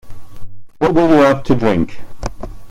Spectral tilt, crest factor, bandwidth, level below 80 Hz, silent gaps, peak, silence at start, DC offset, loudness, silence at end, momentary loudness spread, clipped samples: -7 dB/octave; 14 dB; 13.5 kHz; -34 dBFS; none; 0 dBFS; 0.05 s; under 0.1%; -14 LUFS; 0 s; 19 LU; under 0.1%